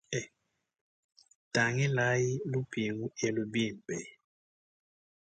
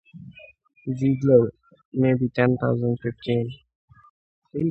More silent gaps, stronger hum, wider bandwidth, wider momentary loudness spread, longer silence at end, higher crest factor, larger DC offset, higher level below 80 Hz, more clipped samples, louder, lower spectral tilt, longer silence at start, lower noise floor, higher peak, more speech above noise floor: second, 0.81-1.09 s, 1.35-1.51 s vs 1.85-1.92 s, 3.75-3.88 s, 4.10-4.42 s; neither; first, 9.2 kHz vs 6.4 kHz; second, 12 LU vs 19 LU; first, 1.2 s vs 0 s; about the same, 20 dB vs 20 dB; neither; second, -70 dBFS vs -56 dBFS; neither; second, -32 LUFS vs -23 LUFS; second, -5 dB/octave vs -9.5 dB/octave; about the same, 0.1 s vs 0.15 s; first, -75 dBFS vs -47 dBFS; second, -14 dBFS vs -4 dBFS; first, 43 dB vs 25 dB